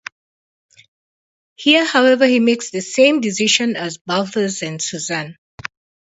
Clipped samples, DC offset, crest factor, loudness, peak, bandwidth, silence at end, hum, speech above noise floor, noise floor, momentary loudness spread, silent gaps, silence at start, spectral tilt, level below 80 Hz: under 0.1%; under 0.1%; 18 dB; -16 LUFS; 0 dBFS; 8 kHz; 0.7 s; none; over 74 dB; under -90 dBFS; 20 LU; 4.01-4.05 s; 1.6 s; -3 dB/octave; -62 dBFS